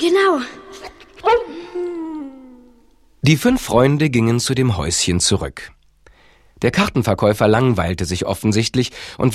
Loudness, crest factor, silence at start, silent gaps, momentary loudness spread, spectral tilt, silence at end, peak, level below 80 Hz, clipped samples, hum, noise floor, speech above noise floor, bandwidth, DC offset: -17 LUFS; 18 dB; 0 s; none; 17 LU; -5 dB/octave; 0 s; 0 dBFS; -40 dBFS; under 0.1%; none; -54 dBFS; 37 dB; 15.5 kHz; under 0.1%